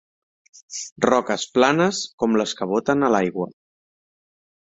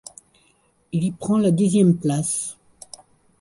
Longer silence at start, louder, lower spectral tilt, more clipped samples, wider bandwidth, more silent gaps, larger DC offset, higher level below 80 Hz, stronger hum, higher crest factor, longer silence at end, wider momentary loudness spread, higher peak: second, 0.7 s vs 0.95 s; about the same, -21 LUFS vs -21 LUFS; second, -4.5 dB/octave vs -6.5 dB/octave; neither; second, 8.4 kHz vs 11.5 kHz; first, 0.92-0.96 s, 2.13-2.18 s vs none; neither; about the same, -62 dBFS vs -58 dBFS; neither; first, 22 dB vs 16 dB; first, 1.2 s vs 0.9 s; second, 14 LU vs 24 LU; first, -2 dBFS vs -6 dBFS